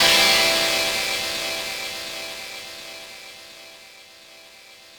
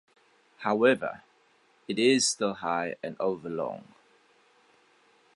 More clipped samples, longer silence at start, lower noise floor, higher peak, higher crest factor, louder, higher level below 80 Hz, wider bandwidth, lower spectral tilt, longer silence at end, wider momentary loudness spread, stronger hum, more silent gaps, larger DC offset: neither; second, 0 s vs 0.6 s; second, -47 dBFS vs -65 dBFS; first, -4 dBFS vs -10 dBFS; about the same, 20 dB vs 20 dB; first, -20 LUFS vs -28 LUFS; first, -54 dBFS vs -74 dBFS; first, over 20 kHz vs 11.5 kHz; second, 0 dB/octave vs -3 dB/octave; second, 0 s vs 1.55 s; first, 25 LU vs 13 LU; neither; neither; neither